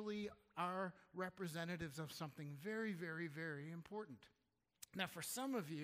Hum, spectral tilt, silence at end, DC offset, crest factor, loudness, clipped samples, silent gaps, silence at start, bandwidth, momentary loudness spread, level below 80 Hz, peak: none; -4.5 dB/octave; 0 s; under 0.1%; 20 dB; -48 LUFS; under 0.1%; none; 0 s; 15.5 kHz; 8 LU; -80 dBFS; -28 dBFS